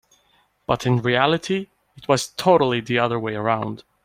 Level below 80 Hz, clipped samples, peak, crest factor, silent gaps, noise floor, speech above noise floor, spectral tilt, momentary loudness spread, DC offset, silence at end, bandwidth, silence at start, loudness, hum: -56 dBFS; under 0.1%; -2 dBFS; 20 dB; none; -62 dBFS; 42 dB; -5.5 dB/octave; 12 LU; under 0.1%; 0.25 s; 16 kHz; 0.7 s; -21 LUFS; none